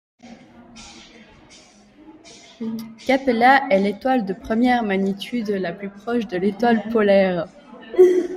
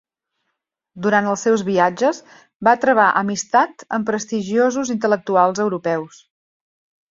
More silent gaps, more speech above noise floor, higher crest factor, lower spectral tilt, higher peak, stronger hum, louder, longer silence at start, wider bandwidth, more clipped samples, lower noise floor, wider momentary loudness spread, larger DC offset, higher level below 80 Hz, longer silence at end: second, none vs 2.55-2.60 s; second, 29 dB vs 58 dB; about the same, 18 dB vs 18 dB; first, -6.5 dB/octave vs -4.5 dB/octave; about the same, -2 dBFS vs -2 dBFS; neither; about the same, -20 LUFS vs -18 LUFS; second, 0.25 s vs 0.95 s; first, 14 kHz vs 7.8 kHz; neither; second, -49 dBFS vs -76 dBFS; first, 16 LU vs 9 LU; neither; first, -56 dBFS vs -64 dBFS; second, 0 s vs 1.05 s